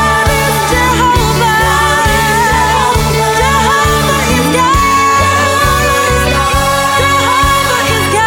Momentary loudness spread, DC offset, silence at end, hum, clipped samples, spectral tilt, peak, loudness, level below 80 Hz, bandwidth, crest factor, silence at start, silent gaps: 2 LU; under 0.1%; 0 s; none; under 0.1%; -3.5 dB/octave; 0 dBFS; -9 LUFS; -22 dBFS; 17.5 kHz; 10 dB; 0 s; none